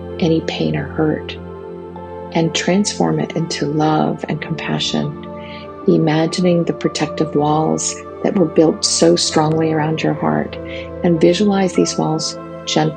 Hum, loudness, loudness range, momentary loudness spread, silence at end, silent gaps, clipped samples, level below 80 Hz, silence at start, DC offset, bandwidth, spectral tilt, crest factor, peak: none; -17 LUFS; 4 LU; 14 LU; 0 s; none; under 0.1%; -52 dBFS; 0 s; under 0.1%; 9.6 kHz; -5 dB/octave; 16 dB; 0 dBFS